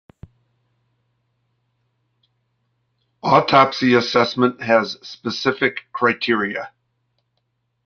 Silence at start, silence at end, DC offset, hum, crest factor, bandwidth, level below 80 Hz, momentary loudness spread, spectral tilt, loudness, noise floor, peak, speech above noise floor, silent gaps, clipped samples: 3.25 s; 1.2 s; under 0.1%; none; 20 dB; 7 kHz; -60 dBFS; 13 LU; -5.5 dB/octave; -18 LUFS; -71 dBFS; -2 dBFS; 53 dB; none; under 0.1%